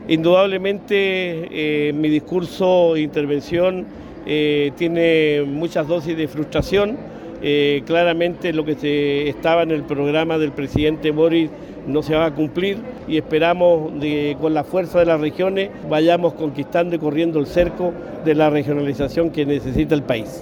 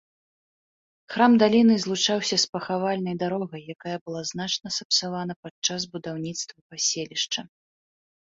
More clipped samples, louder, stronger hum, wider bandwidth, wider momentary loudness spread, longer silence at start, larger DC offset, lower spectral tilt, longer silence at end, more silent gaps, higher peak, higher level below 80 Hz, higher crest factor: neither; first, -19 LUFS vs -24 LUFS; neither; first, 17.5 kHz vs 7.8 kHz; second, 8 LU vs 15 LU; second, 0 s vs 1.1 s; neither; first, -7 dB/octave vs -3.5 dB/octave; second, 0 s vs 0.8 s; second, none vs 2.49-2.53 s, 4.01-4.06 s, 4.85-4.90 s, 5.36-5.43 s, 5.51-5.62 s, 6.61-6.70 s; about the same, -2 dBFS vs -4 dBFS; first, -42 dBFS vs -68 dBFS; second, 16 dB vs 22 dB